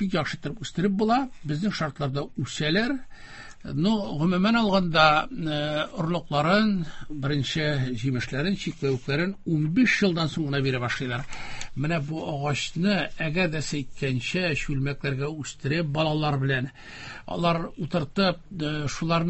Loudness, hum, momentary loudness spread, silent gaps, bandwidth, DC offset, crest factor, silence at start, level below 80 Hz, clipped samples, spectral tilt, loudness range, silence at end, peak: -26 LUFS; none; 11 LU; none; 8.4 kHz; under 0.1%; 22 dB; 0 s; -48 dBFS; under 0.1%; -6 dB/octave; 4 LU; 0 s; -4 dBFS